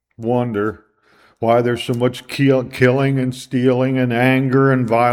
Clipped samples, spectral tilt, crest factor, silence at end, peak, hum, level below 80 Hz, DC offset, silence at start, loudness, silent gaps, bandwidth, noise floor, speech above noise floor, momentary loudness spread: under 0.1%; -7.5 dB/octave; 16 dB; 0 s; 0 dBFS; none; -56 dBFS; under 0.1%; 0.2 s; -17 LUFS; none; 14.5 kHz; -54 dBFS; 38 dB; 6 LU